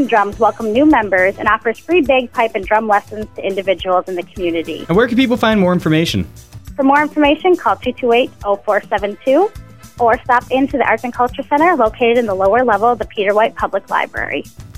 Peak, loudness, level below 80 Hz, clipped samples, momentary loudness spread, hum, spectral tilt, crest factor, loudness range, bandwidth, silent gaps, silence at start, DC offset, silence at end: 0 dBFS; -15 LUFS; -40 dBFS; under 0.1%; 8 LU; none; -6 dB/octave; 14 dB; 2 LU; 16 kHz; none; 0 s; 0.7%; 0.05 s